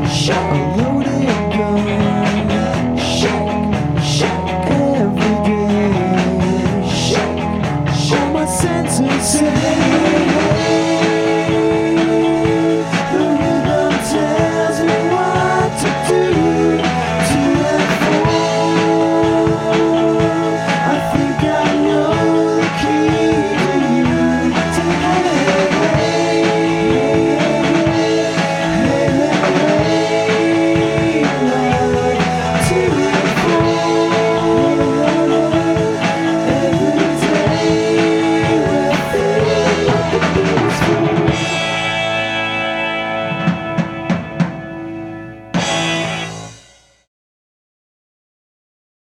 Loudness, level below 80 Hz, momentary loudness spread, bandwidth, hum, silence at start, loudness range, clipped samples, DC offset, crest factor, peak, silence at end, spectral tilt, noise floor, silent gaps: -15 LUFS; -38 dBFS; 4 LU; 15 kHz; none; 0 s; 4 LU; under 0.1%; under 0.1%; 14 dB; 0 dBFS; 2.6 s; -5.5 dB/octave; -47 dBFS; none